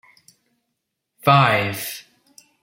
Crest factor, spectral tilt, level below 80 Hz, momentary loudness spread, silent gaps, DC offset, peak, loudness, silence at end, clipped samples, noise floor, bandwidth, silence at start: 22 dB; -5 dB/octave; -60 dBFS; 16 LU; none; under 0.1%; -2 dBFS; -18 LUFS; 0.6 s; under 0.1%; -78 dBFS; 16.5 kHz; 1.25 s